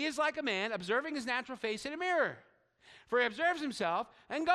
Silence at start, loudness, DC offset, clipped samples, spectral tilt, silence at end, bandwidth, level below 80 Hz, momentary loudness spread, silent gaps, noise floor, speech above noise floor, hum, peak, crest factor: 0 s; -34 LUFS; under 0.1%; under 0.1%; -3.5 dB/octave; 0 s; 13.5 kHz; -74 dBFS; 6 LU; none; -62 dBFS; 28 dB; none; -16 dBFS; 18 dB